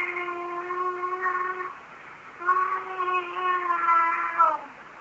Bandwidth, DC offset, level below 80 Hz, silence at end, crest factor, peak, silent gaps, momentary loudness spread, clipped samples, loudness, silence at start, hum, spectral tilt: 7.8 kHz; under 0.1%; -74 dBFS; 0 s; 18 dB; -8 dBFS; none; 17 LU; under 0.1%; -26 LUFS; 0 s; none; -4 dB/octave